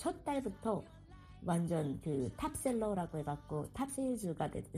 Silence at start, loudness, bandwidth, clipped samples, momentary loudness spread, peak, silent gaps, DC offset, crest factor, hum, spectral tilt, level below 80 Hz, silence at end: 0 s; -39 LUFS; 15 kHz; under 0.1%; 7 LU; -24 dBFS; none; under 0.1%; 16 dB; none; -6.5 dB/octave; -58 dBFS; 0 s